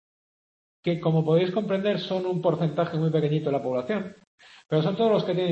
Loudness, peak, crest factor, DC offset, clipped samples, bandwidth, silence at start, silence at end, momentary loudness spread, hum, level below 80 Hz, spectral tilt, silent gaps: -25 LUFS; -10 dBFS; 16 dB; under 0.1%; under 0.1%; 7.2 kHz; 0.85 s; 0 s; 7 LU; none; -68 dBFS; -8.5 dB/octave; 4.27-4.38 s